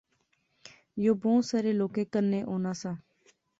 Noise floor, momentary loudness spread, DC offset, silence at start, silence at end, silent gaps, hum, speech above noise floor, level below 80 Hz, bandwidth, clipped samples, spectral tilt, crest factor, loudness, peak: -74 dBFS; 12 LU; under 0.1%; 0.65 s; 0.6 s; none; none; 46 dB; -70 dBFS; 8 kHz; under 0.1%; -7 dB/octave; 16 dB; -29 LUFS; -14 dBFS